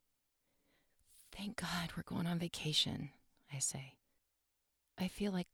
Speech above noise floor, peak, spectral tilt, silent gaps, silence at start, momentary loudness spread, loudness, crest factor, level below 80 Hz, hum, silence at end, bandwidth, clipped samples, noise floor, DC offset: 44 dB; -20 dBFS; -3.5 dB/octave; none; 1.2 s; 16 LU; -40 LUFS; 22 dB; -66 dBFS; none; 0.1 s; 18.5 kHz; under 0.1%; -84 dBFS; under 0.1%